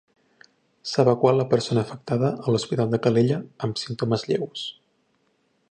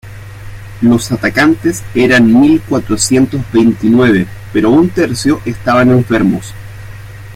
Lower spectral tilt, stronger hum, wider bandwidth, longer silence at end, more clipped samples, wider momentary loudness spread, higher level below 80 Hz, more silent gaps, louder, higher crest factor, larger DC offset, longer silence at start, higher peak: about the same, -6.5 dB/octave vs -5.5 dB/octave; neither; second, 9.8 kHz vs 16 kHz; first, 1 s vs 0 s; neither; second, 10 LU vs 22 LU; second, -62 dBFS vs -36 dBFS; neither; second, -23 LUFS vs -11 LUFS; first, 20 dB vs 10 dB; neither; first, 0.85 s vs 0.05 s; second, -4 dBFS vs 0 dBFS